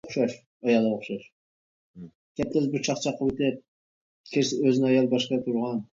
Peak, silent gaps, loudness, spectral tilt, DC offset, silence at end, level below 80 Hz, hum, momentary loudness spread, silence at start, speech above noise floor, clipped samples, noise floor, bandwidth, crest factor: -10 dBFS; 0.46-0.60 s, 1.32-1.94 s, 2.15-2.35 s, 3.68-4.24 s; -26 LUFS; -5.5 dB/octave; under 0.1%; 0.1 s; -60 dBFS; none; 11 LU; 0.05 s; over 65 dB; under 0.1%; under -90 dBFS; 7.8 kHz; 18 dB